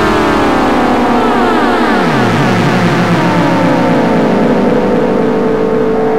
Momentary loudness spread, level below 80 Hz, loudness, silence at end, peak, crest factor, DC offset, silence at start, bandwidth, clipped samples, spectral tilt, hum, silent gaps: 1 LU; -34 dBFS; -10 LUFS; 0 s; -2 dBFS; 10 dB; 5%; 0 s; 16 kHz; under 0.1%; -6.5 dB/octave; none; none